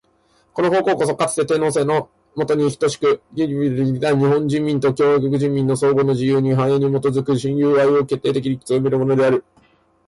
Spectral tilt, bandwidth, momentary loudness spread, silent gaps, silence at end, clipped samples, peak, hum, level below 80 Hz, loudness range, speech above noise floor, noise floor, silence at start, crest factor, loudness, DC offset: -6.5 dB/octave; 11.5 kHz; 5 LU; none; 0.65 s; under 0.1%; -8 dBFS; none; -56 dBFS; 2 LU; 42 dB; -59 dBFS; 0.55 s; 10 dB; -18 LUFS; under 0.1%